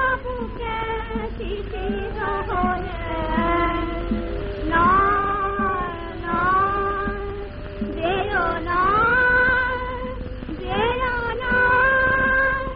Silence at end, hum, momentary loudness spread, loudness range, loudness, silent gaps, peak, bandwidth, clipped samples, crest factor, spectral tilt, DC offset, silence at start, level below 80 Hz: 0 s; none; 13 LU; 5 LU; -21 LUFS; none; -6 dBFS; 5.2 kHz; under 0.1%; 14 dB; -3.5 dB/octave; under 0.1%; 0 s; -34 dBFS